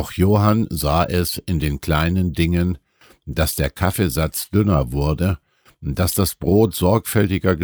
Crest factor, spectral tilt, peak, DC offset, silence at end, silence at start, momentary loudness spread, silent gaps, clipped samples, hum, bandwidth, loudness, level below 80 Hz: 16 dB; -6 dB/octave; -4 dBFS; under 0.1%; 0 s; 0 s; 6 LU; none; under 0.1%; none; over 20 kHz; -19 LUFS; -32 dBFS